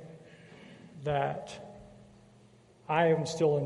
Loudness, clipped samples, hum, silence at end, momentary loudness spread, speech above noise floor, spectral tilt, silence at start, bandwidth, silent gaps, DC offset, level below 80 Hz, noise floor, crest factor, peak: -30 LUFS; under 0.1%; none; 0 s; 26 LU; 31 dB; -6 dB/octave; 0 s; 11.5 kHz; none; under 0.1%; -64 dBFS; -59 dBFS; 20 dB; -12 dBFS